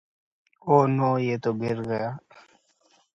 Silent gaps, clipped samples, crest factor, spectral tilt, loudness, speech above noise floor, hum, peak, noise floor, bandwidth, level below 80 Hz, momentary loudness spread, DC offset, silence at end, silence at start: none; under 0.1%; 22 dB; -8.5 dB/octave; -24 LUFS; 40 dB; none; -4 dBFS; -64 dBFS; 7.6 kHz; -66 dBFS; 14 LU; under 0.1%; 0.95 s; 0.65 s